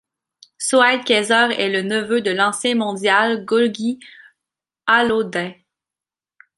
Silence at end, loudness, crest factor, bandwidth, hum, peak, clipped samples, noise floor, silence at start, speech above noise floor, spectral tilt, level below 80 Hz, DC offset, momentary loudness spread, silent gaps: 1.05 s; -18 LUFS; 18 dB; 11.5 kHz; none; -2 dBFS; under 0.1%; -89 dBFS; 0.6 s; 72 dB; -3 dB/octave; -64 dBFS; under 0.1%; 11 LU; none